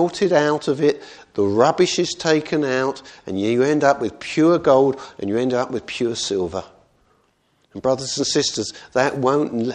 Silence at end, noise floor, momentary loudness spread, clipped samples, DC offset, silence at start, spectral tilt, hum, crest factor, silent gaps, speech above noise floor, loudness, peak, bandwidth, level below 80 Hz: 0 s; -63 dBFS; 10 LU; under 0.1%; under 0.1%; 0 s; -4.5 dB/octave; none; 20 dB; none; 44 dB; -20 LUFS; 0 dBFS; 10 kHz; -58 dBFS